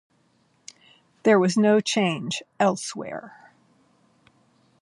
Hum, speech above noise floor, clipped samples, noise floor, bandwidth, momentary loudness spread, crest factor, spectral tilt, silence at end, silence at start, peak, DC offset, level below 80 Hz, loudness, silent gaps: none; 43 dB; under 0.1%; -65 dBFS; 11.5 kHz; 15 LU; 18 dB; -5 dB/octave; 1.5 s; 1.25 s; -6 dBFS; under 0.1%; -74 dBFS; -22 LUFS; none